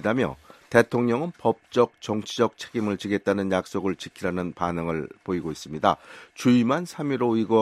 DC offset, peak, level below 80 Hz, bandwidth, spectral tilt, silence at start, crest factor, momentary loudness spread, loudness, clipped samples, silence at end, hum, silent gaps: under 0.1%; -2 dBFS; -58 dBFS; 13.5 kHz; -6 dB/octave; 0 s; 22 dB; 9 LU; -25 LUFS; under 0.1%; 0 s; none; none